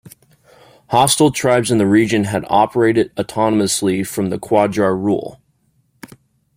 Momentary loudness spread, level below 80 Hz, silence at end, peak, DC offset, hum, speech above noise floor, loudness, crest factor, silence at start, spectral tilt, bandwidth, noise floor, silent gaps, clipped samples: 7 LU; -52 dBFS; 1.25 s; 0 dBFS; under 0.1%; none; 46 dB; -16 LUFS; 16 dB; 0.9 s; -4.5 dB/octave; 16.5 kHz; -61 dBFS; none; under 0.1%